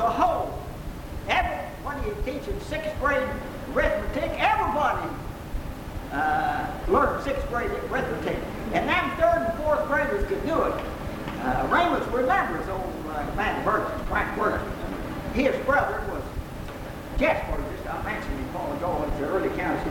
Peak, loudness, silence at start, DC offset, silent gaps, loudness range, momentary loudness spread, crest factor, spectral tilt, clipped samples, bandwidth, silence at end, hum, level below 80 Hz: -8 dBFS; -27 LUFS; 0 s; under 0.1%; none; 3 LU; 11 LU; 18 dB; -6 dB/octave; under 0.1%; 18 kHz; 0 s; none; -38 dBFS